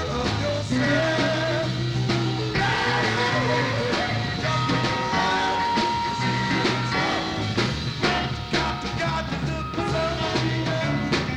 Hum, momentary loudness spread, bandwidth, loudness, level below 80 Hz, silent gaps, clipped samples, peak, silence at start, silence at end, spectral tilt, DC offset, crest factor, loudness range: none; 4 LU; 11 kHz; -24 LUFS; -42 dBFS; none; under 0.1%; -8 dBFS; 0 s; 0 s; -5 dB/octave; under 0.1%; 16 dB; 2 LU